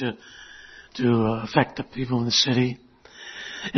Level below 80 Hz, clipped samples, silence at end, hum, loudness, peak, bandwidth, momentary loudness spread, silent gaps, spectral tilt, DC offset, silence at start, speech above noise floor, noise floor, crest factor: -54 dBFS; under 0.1%; 0 s; none; -23 LUFS; -2 dBFS; 6.4 kHz; 23 LU; none; -4.5 dB/octave; under 0.1%; 0 s; 21 dB; -44 dBFS; 24 dB